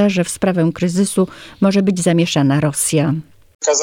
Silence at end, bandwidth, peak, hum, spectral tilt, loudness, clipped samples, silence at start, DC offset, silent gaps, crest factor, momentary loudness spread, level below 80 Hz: 0 s; 17 kHz; -2 dBFS; none; -5 dB/octave; -16 LUFS; under 0.1%; 0 s; under 0.1%; 3.55-3.59 s; 14 dB; 5 LU; -52 dBFS